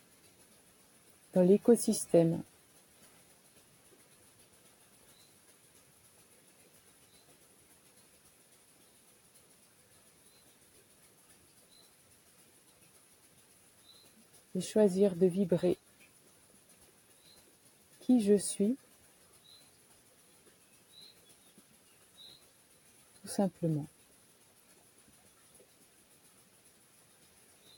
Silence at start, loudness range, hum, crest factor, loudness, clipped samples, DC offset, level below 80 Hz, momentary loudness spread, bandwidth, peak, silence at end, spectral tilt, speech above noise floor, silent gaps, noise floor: 1.35 s; 18 LU; none; 24 dB; -30 LUFS; under 0.1%; under 0.1%; -78 dBFS; 28 LU; 17.5 kHz; -14 dBFS; 3.9 s; -6.5 dB/octave; 36 dB; none; -64 dBFS